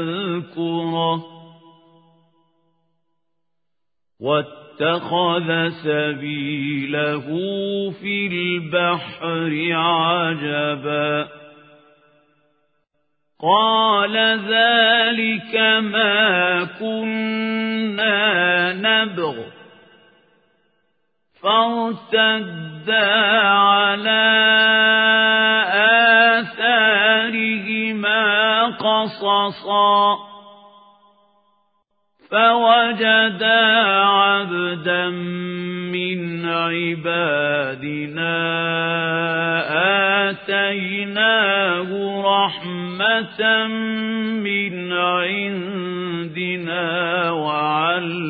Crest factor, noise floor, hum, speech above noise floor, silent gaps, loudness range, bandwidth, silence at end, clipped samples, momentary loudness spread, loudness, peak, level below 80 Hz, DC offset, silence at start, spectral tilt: 18 dB; -84 dBFS; none; 65 dB; none; 8 LU; 5 kHz; 0 s; under 0.1%; 11 LU; -18 LUFS; -2 dBFS; -70 dBFS; under 0.1%; 0 s; -9.5 dB/octave